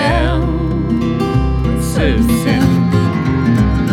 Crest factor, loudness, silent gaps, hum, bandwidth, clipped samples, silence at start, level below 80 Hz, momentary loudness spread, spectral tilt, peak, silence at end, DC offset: 12 dB; -14 LUFS; none; none; 16.5 kHz; under 0.1%; 0 s; -22 dBFS; 4 LU; -7 dB/octave; -2 dBFS; 0 s; under 0.1%